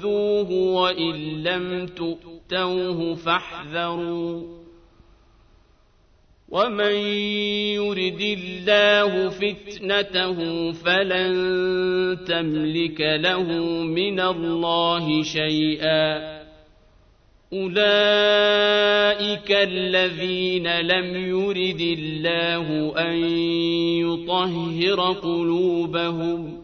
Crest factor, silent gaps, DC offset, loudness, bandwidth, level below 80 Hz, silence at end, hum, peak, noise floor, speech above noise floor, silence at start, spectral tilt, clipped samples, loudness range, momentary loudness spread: 18 dB; none; under 0.1%; -22 LUFS; 6.6 kHz; -54 dBFS; 0 s; none; -4 dBFS; -57 dBFS; 35 dB; 0 s; -5.5 dB/octave; under 0.1%; 7 LU; 9 LU